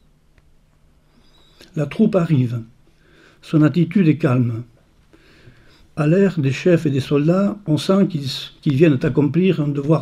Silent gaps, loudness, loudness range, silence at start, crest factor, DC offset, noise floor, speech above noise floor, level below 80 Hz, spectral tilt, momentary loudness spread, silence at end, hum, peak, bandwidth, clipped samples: none; -18 LUFS; 4 LU; 1.75 s; 16 dB; under 0.1%; -54 dBFS; 38 dB; -52 dBFS; -8 dB/octave; 9 LU; 0 s; none; -2 dBFS; 12.5 kHz; under 0.1%